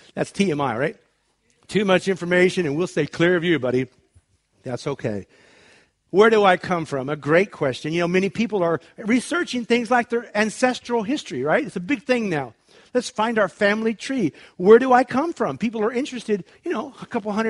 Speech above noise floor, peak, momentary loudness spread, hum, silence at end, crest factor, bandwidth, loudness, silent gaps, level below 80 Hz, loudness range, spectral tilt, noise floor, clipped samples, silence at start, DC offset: 45 dB; -2 dBFS; 11 LU; none; 0 s; 20 dB; 11.5 kHz; -21 LUFS; none; -62 dBFS; 3 LU; -5.5 dB/octave; -66 dBFS; under 0.1%; 0.15 s; under 0.1%